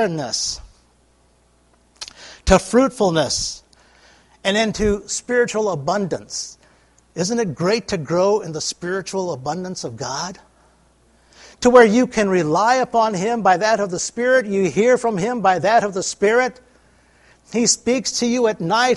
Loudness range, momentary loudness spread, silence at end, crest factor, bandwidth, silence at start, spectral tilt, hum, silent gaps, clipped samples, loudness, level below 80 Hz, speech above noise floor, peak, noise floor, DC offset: 6 LU; 11 LU; 0 s; 20 dB; 11.5 kHz; 0 s; -4 dB/octave; none; none; under 0.1%; -19 LUFS; -42 dBFS; 39 dB; 0 dBFS; -57 dBFS; under 0.1%